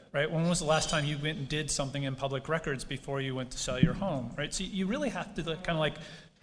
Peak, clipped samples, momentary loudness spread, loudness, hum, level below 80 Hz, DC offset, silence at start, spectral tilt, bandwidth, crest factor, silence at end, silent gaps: -8 dBFS; under 0.1%; 8 LU; -32 LUFS; none; -48 dBFS; under 0.1%; 0 s; -4.5 dB/octave; 10.5 kHz; 24 dB; 0.15 s; none